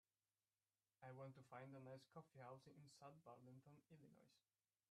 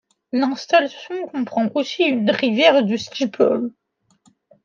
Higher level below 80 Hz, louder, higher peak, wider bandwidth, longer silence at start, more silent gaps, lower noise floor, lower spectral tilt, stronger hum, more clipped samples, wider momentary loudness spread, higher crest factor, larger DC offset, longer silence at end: second, under -90 dBFS vs -70 dBFS; second, -63 LUFS vs -19 LUFS; second, -46 dBFS vs -2 dBFS; first, 11.5 kHz vs 7.4 kHz; first, 1 s vs 0.35 s; neither; first, under -90 dBFS vs -61 dBFS; first, -6.5 dB/octave vs -5 dB/octave; neither; neither; second, 7 LU vs 12 LU; about the same, 20 dB vs 18 dB; neither; second, 0.5 s vs 0.95 s